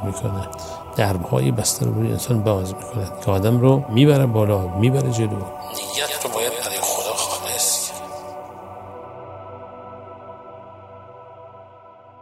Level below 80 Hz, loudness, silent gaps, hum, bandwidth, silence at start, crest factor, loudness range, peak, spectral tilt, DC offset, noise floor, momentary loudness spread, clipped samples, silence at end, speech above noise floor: -54 dBFS; -20 LUFS; none; none; 16 kHz; 0 s; 20 dB; 19 LU; -2 dBFS; -5 dB/octave; under 0.1%; -45 dBFS; 22 LU; under 0.1%; 0 s; 26 dB